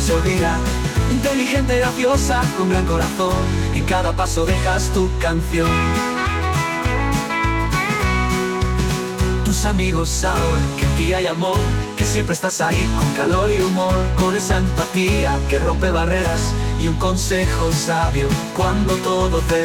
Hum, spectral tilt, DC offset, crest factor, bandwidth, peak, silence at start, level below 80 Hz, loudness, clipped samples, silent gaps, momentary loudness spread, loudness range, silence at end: none; -5 dB/octave; under 0.1%; 12 dB; 18.5 kHz; -6 dBFS; 0 s; -24 dBFS; -19 LUFS; under 0.1%; none; 3 LU; 1 LU; 0 s